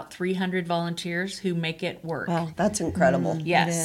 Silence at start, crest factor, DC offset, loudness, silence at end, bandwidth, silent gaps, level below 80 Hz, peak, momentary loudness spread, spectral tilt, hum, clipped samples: 0 s; 20 dB; under 0.1%; -26 LUFS; 0 s; 13.5 kHz; none; -56 dBFS; -6 dBFS; 7 LU; -5 dB/octave; none; under 0.1%